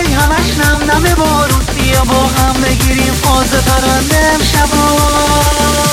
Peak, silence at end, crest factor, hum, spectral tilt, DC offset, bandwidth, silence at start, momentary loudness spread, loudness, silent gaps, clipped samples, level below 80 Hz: 0 dBFS; 0 s; 10 dB; none; -4 dB/octave; under 0.1%; 16.5 kHz; 0 s; 2 LU; -10 LUFS; none; under 0.1%; -16 dBFS